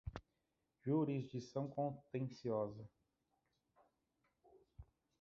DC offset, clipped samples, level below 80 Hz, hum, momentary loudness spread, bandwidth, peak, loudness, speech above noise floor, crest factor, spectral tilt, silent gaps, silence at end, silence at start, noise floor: under 0.1%; under 0.1%; -68 dBFS; none; 19 LU; 7.4 kHz; -28 dBFS; -43 LUFS; 45 dB; 18 dB; -8.5 dB/octave; none; 0.35 s; 0.05 s; -87 dBFS